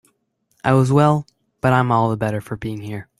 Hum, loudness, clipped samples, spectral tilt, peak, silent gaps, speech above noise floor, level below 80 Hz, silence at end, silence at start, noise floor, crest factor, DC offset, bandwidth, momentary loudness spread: none; -19 LUFS; under 0.1%; -7.5 dB/octave; -2 dBFS; none; 49 dB; -50 dBFS; 0.15 s; 0.65 s; -67 dBFS; 18 dB; under 0.1%; 12.5 kHz; 13 LU